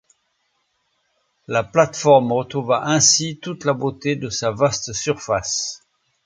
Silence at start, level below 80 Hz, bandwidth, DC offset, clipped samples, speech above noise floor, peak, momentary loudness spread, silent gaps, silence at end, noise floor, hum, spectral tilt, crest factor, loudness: 1.5 s; -54 dBFS; 10 kHz; under 0.1%; under 0.1%; 50 dB; 0 dBFS; 10 LU; none; 0.5 s; -69 dBFS; none; -3.5 dB/octave; 20 dB; -19 LUFS